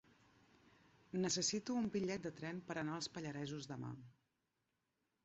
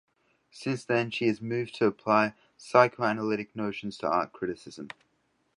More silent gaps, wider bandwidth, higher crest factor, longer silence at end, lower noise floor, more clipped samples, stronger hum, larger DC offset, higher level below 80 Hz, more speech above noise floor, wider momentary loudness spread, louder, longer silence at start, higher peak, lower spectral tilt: neither; second, 8 kHz vs 11 kHz; second, 18 dB vs 24 dB; first, 1.1 s vs 0.7 s; first, -87 dBFS vs -73 dBFS; neither; neither; neither; second, -76 dBFS vs -70 dBFS; about the same, 45 dB vs 44 dB; second, 11 LU vs 16 LU; second, -43 LUFS vs -28 LUFS; first, 1.15 s vs 0.55 s; second, -26 dBFS vs -4 dBFS; second, -4.5 dB/octave vs -6 dB/octave